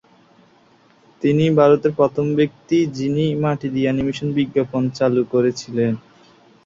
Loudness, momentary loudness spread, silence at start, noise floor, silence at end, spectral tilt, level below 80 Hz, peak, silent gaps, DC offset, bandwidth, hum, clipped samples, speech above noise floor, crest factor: -19 LUFS; 7 LU; 1.2 s; -54 dBFS; 0.65 s; -7.5 dB/octave; -54 dBFS; -2 dBFS; none; under 0.1%; 7.6 kHz; none; under 0.1%; 36 dB; 16 dB